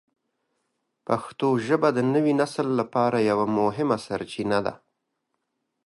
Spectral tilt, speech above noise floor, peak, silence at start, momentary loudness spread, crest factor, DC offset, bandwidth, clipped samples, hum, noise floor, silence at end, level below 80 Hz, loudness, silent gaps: -6.5 dB/octave; 55 dB; -6 dBFS; 1.1 s; 7 LU; 18 dB; under 0.1%; 11.5 kHz; under 0.1%; none; -79 dBFS; 1.1 s; -64 dBFS; -24 LUFS; none